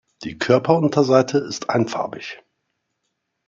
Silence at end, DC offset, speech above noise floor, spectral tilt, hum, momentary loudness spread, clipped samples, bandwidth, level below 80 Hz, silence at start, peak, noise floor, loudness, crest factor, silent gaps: 1.1 s; under 0.1%; 56 dB; -6 dB/octave; none; 16 LU; under 0.1%; 7.6 kHz; -62 dBFS; 0.2 s; -2 dBFS; -75 dBFS; -19 LUFS; 18 dB; none